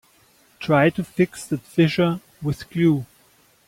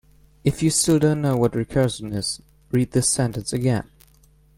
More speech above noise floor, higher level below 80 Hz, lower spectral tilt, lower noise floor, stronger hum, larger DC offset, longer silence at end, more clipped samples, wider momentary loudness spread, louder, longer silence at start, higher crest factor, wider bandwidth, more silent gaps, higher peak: about the same, 37 dB vs 34 dB; second, -56 dBFS vs -46 dBFS; first, -7 dB/octave vs -5 dB/octave; about the same, -57 dBFS vs -55 dBFS; neither; neither; second, 0.6 s vs 0.75 s; neither; about the same, 11 LU vs 9 LU; about the same, -21 LUFS vs -22 LUFS; first, 0.6 s vs 0.45 s; about the same, 18 dB vs 16 dB; about the same, 16 kHz vs 16.5 kHz; neither; about the same, -4 dBFS vs -6 dBFS